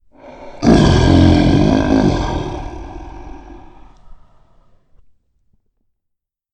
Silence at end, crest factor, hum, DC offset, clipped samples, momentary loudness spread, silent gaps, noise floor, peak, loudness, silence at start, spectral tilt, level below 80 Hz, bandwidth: 2.4 s; 16 dB; none; under 0.1%; under 0.1%; 24 LU; none; -75 dBFS; 0 dBFS; -13 LUFS; 0.25 s; -7 dB/octave; -26 dBFS; 9.2 kHz